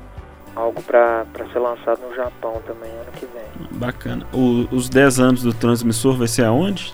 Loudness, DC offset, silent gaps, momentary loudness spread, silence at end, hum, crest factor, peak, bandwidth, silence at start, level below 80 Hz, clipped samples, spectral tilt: -18 LUFS; under 0.1%; none; 19 LU; 0 s; none; 18 dB; 0 dBFS; 16.5 kHz; 0 s; -42 dBFS; under 0.1%; -5.5 dB/octave